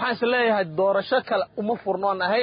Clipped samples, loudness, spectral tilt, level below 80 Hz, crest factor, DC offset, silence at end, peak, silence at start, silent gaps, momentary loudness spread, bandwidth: under 0.1%; -23 LUFS; -9.5 dB/octave; -66 dBFS; 12 dB; under 0.1%; 0 s; -10 dBFS; 0 s; none; 5 LU; 5.2 kHz